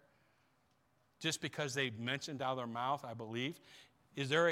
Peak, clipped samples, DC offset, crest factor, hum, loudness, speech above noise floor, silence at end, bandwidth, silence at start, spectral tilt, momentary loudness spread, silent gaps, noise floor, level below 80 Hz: -18 dBFS; under 0.1%; under 0.1%; 22 dB; none; -39 LUFS; 37 dB; 0 s; 16.5 kHz; 1.2 s; -4 dB/octave; 7 LU; none; -76 dBFS; -82 dBFS